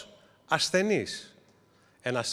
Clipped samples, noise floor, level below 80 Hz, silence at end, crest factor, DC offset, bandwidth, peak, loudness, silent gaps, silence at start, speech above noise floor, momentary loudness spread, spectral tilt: under 0.1%; -63 dBFS; -72 dBFS; 0 s; 22 dB; under 0.1%; 14.5 kHz; -10 dBFS; -28 LUFS; none; 0 s; 35 dB; 14 LU; -3.5 dB/octave